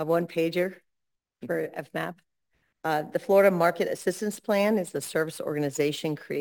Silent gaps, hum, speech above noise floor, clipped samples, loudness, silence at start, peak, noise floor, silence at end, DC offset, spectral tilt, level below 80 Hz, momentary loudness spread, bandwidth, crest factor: none; none; 57 dB; under 0.1%; -27 LUFS; 0 s; -10 dBFS; -83 dBFS; 0 s; under 0.1%; -5 dB/octave; -74 dBFS; 12 LU; 19.5 kHz; 18 dB